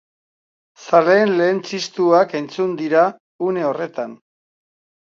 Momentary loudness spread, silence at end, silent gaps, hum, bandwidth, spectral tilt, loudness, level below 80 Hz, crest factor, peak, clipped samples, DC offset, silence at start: 11 LU; 0.9 s; 3.20-3.39 s; none; 7.6 kHz; -5.5 dB/octave; -18 LUFS; -72 dBFS; 18 dB; 0 dBFS; under 0.1%; under 0.1%; 0.8 s